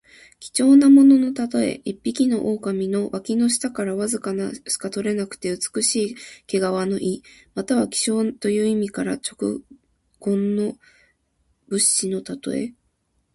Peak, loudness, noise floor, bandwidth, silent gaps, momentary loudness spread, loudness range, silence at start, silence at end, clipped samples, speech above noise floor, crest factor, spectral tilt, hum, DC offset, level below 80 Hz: -4 dBFS; -21 LUFS; -69 dBFS; 11.5 kHz; none; 13 LU; 6 LU; 0.4 s; 0.65 s; under 0.1%; 48 dB; 16 dB; -4 dB/octave; none; under 0.1%; -60 dBFS